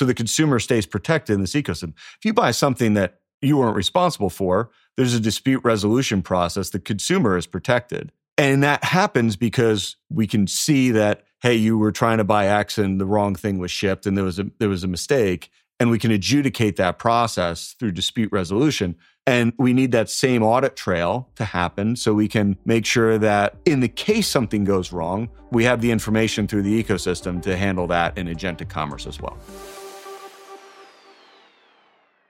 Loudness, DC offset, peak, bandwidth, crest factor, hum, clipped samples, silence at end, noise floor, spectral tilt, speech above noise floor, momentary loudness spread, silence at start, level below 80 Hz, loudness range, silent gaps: -20 LUFS; under 0.1%; -2 dBFS; 16.5 kHz; 20 dB; none; under 0.1%; 1.45 s; -60 dBFS; -5 dB/octave; 40 dB; 9 LU; 0 s; -48 dBFS; 4 LU; 3.34-3.40 s, 8.32-8.37 s